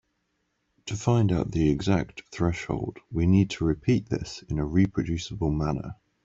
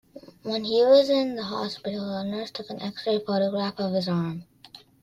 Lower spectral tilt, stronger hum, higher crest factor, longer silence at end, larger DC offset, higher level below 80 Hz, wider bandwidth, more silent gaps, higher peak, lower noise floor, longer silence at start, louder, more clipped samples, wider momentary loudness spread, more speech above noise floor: about the same, -7 dB/octave vs -6.5 dB/octave; neither; about the same, 18 dB vs 18 dB; about the same, 0.3 s vs 0.25 s; neither; first, -44 dBFS vs -66 dBFS; second, 7.8 kHz vs 13.5 kHz; neither; about the same, -10 dBFS vs -8 dBFS; first, -75 dBFS vs -51 dBFS; first, 0.85 s vs 0.15 s; about the same, -27 LUFS vs -25 LUFS; neither; second, 10 LU vs 15 LU; first, 50 dB vs 26 dB